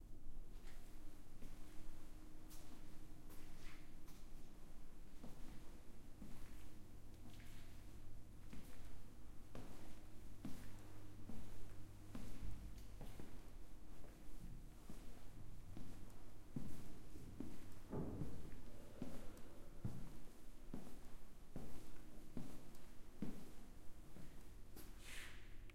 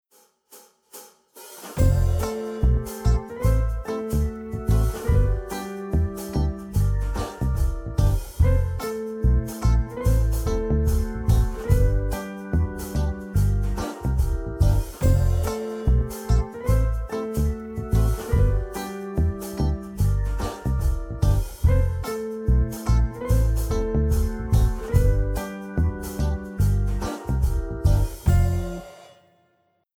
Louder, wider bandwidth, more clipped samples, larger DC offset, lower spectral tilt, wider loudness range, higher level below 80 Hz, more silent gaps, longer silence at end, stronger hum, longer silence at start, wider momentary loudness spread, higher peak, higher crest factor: second, -59 LUFS vs -25 LUFS; second, 15.5 kHz vs 17.5 kHz; neither; neither; second, -5.5 dB/octave vs -7 dB/octave; first, 7 LU vs 2 LU; second, -56 dBFS vs -24 dBFS; neither; second, 0 s vs 0.95 s; neither; second, 0 s vs 0.55 s; about the same, 9 LU vs 7 LU; second, -32 dBFS vs -6 dBFS; about the same, 12 dB vs 16 dB